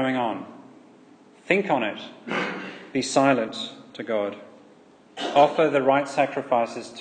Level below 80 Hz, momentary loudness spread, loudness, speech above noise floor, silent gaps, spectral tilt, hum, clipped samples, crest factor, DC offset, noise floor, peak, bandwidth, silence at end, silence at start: -74 dBFS; 16 LU; -24 LUFS; 29 dB; none; -4.5 dB/octave; none; under 0.1%; 20 dB; under 0.1%; -53 dBFS; -4 dBFS; 9.8 kHz; 0 s; 0 s